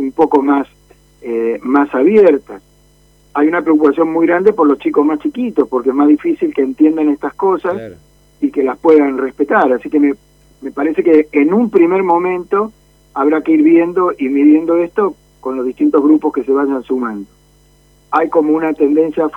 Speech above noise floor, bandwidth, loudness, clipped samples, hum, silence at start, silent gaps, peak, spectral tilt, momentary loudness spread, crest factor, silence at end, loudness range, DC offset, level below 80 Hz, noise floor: 37 dB; 4.2 kHz; -13 LUFS; under 0.1%; none; 0 s; none; 0 dBFS; -8 dB/octave; 10 LU; 12 dB; 0 s; 3 LU; under 0.1%; -52 dBFS; -49 dBFS